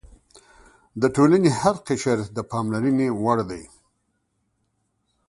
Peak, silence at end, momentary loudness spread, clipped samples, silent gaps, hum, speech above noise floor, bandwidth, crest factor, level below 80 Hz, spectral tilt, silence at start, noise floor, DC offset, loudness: -4 dBFS; 1.65 s; 12 LU; under 0.1%; none; none; 51 dB; 11.5 kHz; 20 dB; -54 dBFS; -6.5 dB/octave; 0.95 s; -72 dBFS; under 0.1%; -22 LUFS